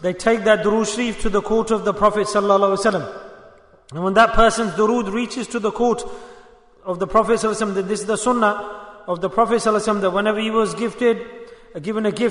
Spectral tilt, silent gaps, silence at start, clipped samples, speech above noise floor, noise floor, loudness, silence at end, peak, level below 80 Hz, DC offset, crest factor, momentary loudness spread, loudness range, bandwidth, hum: -4.5 dB/octave; none; 0 s; under 0.1%; 29 dB; -47 dBFS; -19 LUFS; 0 s; -2 dBFS; -38 dBFS; under 0.1%; 16 dB; 15 LU; 3 LU; 11 kHz; none